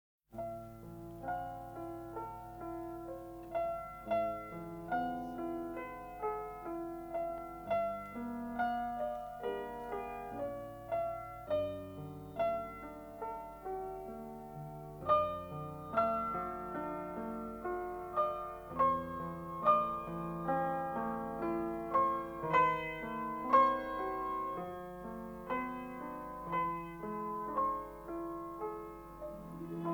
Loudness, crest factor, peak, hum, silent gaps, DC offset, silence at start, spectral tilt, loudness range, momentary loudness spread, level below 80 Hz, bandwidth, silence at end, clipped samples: -38 LUFS; 22 dB; -16 dBFS; none; none; under 0.1%; 0.3 s; -7 dB/octave; 7 LU; 14 LU; -60 dBFS; over 20 kHz; 0 s; under 0.1%